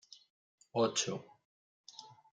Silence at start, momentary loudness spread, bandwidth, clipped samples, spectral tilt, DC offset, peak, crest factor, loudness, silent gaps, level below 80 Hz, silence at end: 0.1 s; 24 LU; 10 kHz; under 0.1%; -3 dB/octave; under 0.1%; -20 dBFS; 20 dB; -35 LUFS; 0.30-0.58 s, 1.45-1.84 s; -86 dBFS; 0.25 s